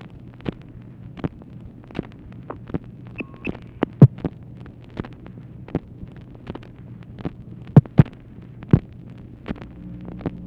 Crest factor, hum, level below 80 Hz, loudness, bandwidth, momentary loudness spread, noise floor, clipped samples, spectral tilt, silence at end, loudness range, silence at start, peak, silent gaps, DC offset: 24 dB; none; -44 dBFS; -22 LUFS; 4.5 kHz; 26 LU; -41 dBFS; under 0.1%; -10.5 dB/octave; 0 s; 13 LU; 0.45 s; 0 dBFS; none; under 0.1%